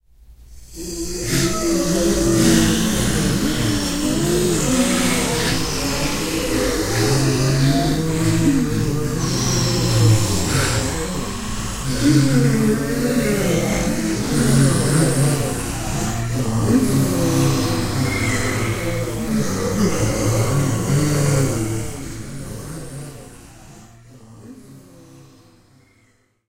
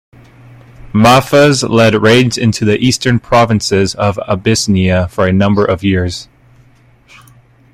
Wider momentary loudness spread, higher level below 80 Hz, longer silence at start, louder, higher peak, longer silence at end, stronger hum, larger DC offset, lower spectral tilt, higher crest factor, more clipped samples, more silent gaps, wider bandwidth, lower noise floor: first, 10 LU vs 7 LU; first, -32 dBFS vs -40 dBFS; second, 0.2 s vs 0.85 s; second, -19 LUFS vs -11 LUFS; about the same, -2 dBFS vs 0 dBFS; second, 1 s vs 1.5 s; neither; first, 0.6% vs under 0.1%; about the same, -5 dB/octave vs -5 dB/octave; first, 18 dB vs 12 dB; neither; neither; about the same, 16 kHz vs 16 kHz; first, -59 dBFS vs -46 dBFS